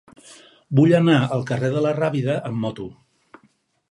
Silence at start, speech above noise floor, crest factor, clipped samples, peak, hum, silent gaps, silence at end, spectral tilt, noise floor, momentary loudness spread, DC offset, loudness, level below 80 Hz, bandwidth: 0.3 s; 43 dB; 18 dB; under 0.1%; -2 dBFS; none; none; 1 s; -7.5 dB/octave; -62 dBFS; 13 LU; under 0.1%; -20 LUFS; -62 dBFS; 11 kHz